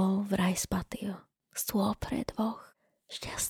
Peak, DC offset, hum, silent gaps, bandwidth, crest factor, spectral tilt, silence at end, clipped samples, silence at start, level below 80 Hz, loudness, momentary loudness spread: -16 dBFS; under 0.1%; none; none; 19 kHz; 18 dB; -4.5 dB/octave; 0 s; under 0.1%; 0 s; -52 dBFS; -33 LUFS; 13 LU